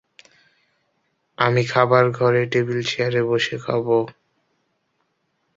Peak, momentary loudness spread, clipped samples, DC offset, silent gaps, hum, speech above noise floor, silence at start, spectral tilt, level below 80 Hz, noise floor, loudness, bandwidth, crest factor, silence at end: -2 dBFS; 6 LU; under 0.1%; under 0.1%; none; none; 51 dB; 1.4 s; -6 dB/octave; -62 dBFS; -71 dBFS; -20 LUFS; 7.8 kHz; 20 dB; 1.45 s